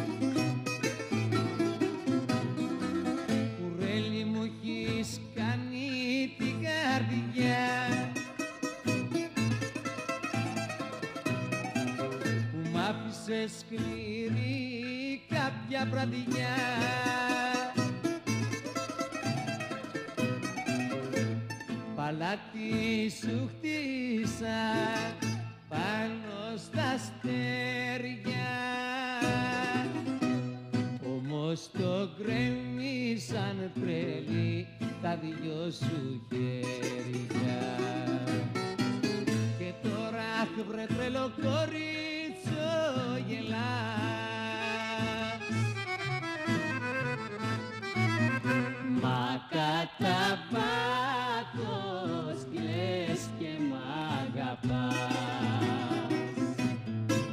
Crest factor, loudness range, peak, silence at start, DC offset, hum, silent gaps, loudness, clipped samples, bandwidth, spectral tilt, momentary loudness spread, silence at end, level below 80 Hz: 14 dB; 3 LU; -18 dBFS; 0 s; under 0.1%; none; none; -33 LUFS; under 0.1%; 15.5 kHz; -5.5 dB/octave; 6 LU; 0 s; -64 dBFS